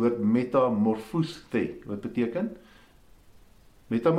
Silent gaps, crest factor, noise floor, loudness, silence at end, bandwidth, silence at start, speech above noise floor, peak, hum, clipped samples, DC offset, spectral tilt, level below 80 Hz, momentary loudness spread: none; 18 dB; -55 dBFS; -28 LUFS; 0 s; 12 kHz; 0 s; 29 dB; -10 dBFS; none; under 0.1%; under 0.1%; -8 dB/octave; -60 dBFS; 10 LU